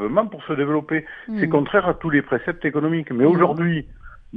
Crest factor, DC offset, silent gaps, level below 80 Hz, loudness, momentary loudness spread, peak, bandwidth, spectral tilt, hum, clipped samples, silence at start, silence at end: 18 dB; under 0.1%; none; -48 dBFS; -21 LUFS; 8 LU; -2 dBFS; 4.7 kHz; -10 dB/octave; none; under 0.1%; 0 s; 0 s